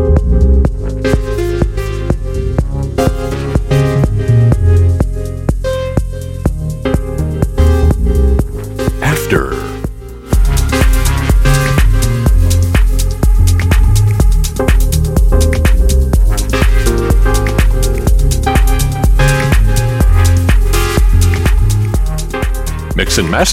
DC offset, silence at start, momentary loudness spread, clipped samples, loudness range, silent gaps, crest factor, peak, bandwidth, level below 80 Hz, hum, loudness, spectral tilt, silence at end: under 0.1%; 0 s; 7 LU; under 0.1%; 3 LU; none; 10 dB; 0 dBFS; 16 kHz; -12 dBFS; none; -13 LUFS; -5.5 dB/octave; 0 s